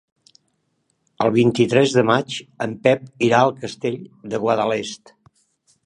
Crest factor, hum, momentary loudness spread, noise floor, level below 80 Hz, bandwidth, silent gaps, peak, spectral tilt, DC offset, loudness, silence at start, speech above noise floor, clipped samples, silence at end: 20 dB; none; 13 LU; -69 dBFS; -62 dBFS; 10.5 kHz; none; -2 dBFS; -5.5 dB/octave; under 0.1%; -19 LUFS; 1.2 s; 50 dB; under 0.1%; 0.9 s